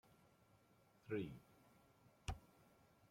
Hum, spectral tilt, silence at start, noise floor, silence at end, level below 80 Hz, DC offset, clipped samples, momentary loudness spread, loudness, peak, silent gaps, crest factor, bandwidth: none; -6 dB/octave; 0.1 s; -74 dBFS; 0.05 s; -66 dBFS; under 0.1%; under 0.1%; 15 LU; -51 LUFS; -32 dBFS; none; 22 dB; 16.5 kHz